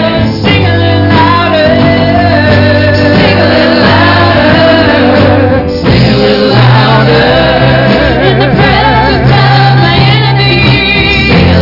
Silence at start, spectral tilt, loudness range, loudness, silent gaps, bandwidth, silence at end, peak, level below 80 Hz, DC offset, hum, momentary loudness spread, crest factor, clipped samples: 0 s; -7.5 dB/octave; 1 LU; -5 LUFS; none; 5.8 kHz; 0 s; 0 dBFS; -22 dBFS; under 0.1%; none; 2 LU; 6 dB; 0.2%